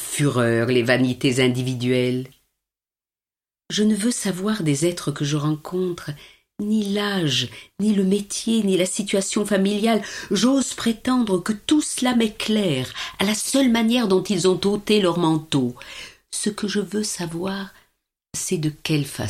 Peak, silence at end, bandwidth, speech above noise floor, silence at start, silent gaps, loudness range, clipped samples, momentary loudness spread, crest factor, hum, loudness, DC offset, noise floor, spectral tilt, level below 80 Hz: -2 dBFS; 0 s; 15.5 kHz; over 69 dB; 0 s; none; 4 LU; under 0.1%; 9 LU; 18 dB; none; -21 LUFS; under 0.1%; under -90 dBFS; -4.5 dB/octave; -56 dBFS